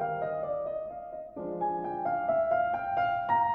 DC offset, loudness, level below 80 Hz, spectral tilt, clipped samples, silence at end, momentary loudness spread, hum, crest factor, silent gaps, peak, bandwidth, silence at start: under 0.1%; -31 LUFS; -64 dBFS; -8.5 dB/octave; under 0.1%; 0 s; 12 LU; none; 14 dB; none; -16 dBFS; 5.2 kHz; 0 s